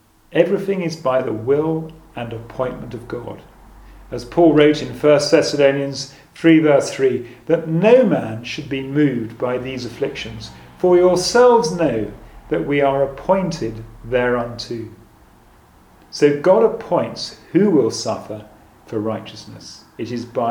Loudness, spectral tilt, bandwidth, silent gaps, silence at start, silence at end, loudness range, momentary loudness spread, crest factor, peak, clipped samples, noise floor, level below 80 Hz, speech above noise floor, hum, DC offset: -18 LUFS; -5.5 dB/octave; 17 kHz; none; 0.3 s; 0 s; 6 LU; 18 LU; 18 dB; 0 dBFS; under 0.1%; -49 dBFS; -48 dBFS; 31 dB; none; under 0.1%